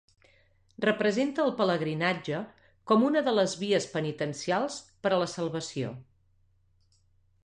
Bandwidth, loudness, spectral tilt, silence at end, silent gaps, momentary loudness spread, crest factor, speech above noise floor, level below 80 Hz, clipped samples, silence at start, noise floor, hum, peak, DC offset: 10.5 kHz; -29 LUFS; -5 dB/octave; 1.4 s; none; 10 LU; 18 dB; 38 dB; -70 dBFS; under 0.1%; 0.8 s; -66 dBFS; none; -12 dBFS; under 0.1%